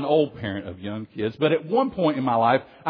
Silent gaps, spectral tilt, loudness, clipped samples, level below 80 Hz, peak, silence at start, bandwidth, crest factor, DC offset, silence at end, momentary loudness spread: none; -9.5 dB/octave; -24 LUFS; under 0.1%; -60 dBFS; -6 dBFS; 0 s; 5.2 kHz; 16 dB; under 0.1%; 0 s; 12 LU